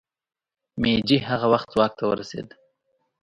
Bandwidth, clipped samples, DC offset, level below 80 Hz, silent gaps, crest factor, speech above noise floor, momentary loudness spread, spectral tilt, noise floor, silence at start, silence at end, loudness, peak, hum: 10.5 kHz; under 0.1%; under 0.1%; -52 dBFS; none; 20 dB; 50 dB; 16 LU; -6.5 dB/octave; -72 dBFS; 0.75 s; 0.8 s; -22 LUFS; -6 dBFS; none